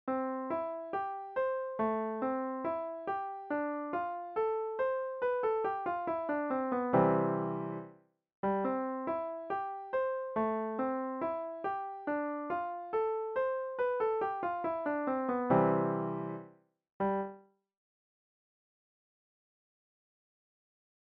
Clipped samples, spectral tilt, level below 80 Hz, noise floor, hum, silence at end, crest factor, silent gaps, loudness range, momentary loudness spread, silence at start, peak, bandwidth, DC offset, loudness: under 0.1%; -7 dB/octave; -72 dBFS; -58 dBFS; none; 3.75 s; 20 dB; 8.35-8.43 s, 16.92-17.00 s; 4 LU; 8 LU; 0.05 s; -14 dBFS; 4.6 kHz; under 0.1%; -34 LUFS